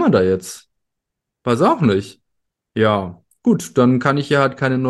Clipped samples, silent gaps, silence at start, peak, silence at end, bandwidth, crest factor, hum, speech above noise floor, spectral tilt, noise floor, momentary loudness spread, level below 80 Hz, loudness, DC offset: under 0.1%; none; 0 s; -2 dBFS; 0 s; 12.5 kHz; 16 dB; none; 64 dB; -6.5 dB/octave; -80 dBFS; 15 LU; -56 dBFS; -17 LUFS; under 0.1%